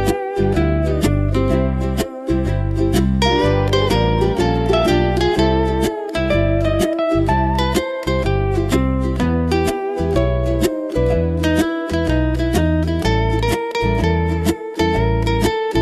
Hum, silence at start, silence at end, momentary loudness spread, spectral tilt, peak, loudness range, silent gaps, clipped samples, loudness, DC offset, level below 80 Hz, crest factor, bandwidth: none; 0 s; 0 s; 4 LU; -6.5 dB/octave; -4 dBFS; 2 LU; none; under 0.1%; -18 LUFS; under 0.1%; -24 dBFS; 14 dB; 14 kHz